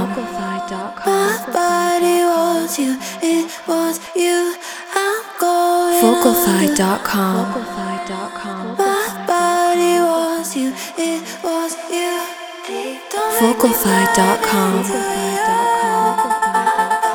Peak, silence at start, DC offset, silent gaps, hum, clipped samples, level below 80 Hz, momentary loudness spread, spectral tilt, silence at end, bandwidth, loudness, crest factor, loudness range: 0 dBFS; 0 s; under 0.1%; none; none; under 0.1%; -54 dBFS; 11 LU; -4 dB/octave; 0 s; over 20 kHz; -17 LUFS; 18 dB; 3 LU